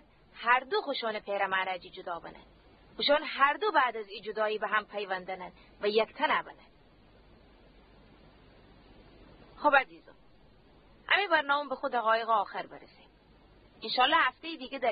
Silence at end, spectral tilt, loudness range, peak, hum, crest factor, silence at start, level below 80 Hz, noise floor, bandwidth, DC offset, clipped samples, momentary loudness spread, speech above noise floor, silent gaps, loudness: 0 s; -6.5 dB/octave; 5 LU; -8 dBFS; none; 24 dB; 0.35 s; -66 dBFS; -61 dBFS; 5 kHz; under 0.1%; under 0.1%; 16 LU; 31 dB; none; -29 LUFS